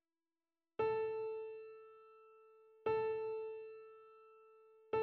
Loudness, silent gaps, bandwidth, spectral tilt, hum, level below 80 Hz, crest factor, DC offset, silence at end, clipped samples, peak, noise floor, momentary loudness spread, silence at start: -42 LUFS; none; 4.8 kHz; -4 dB/octave; none; -80 dBFS; 16 dB; under 0.1%; 0 s; under 0.1%; -28 dBFS; under -90 dBFS; 25 LU; 0.8 s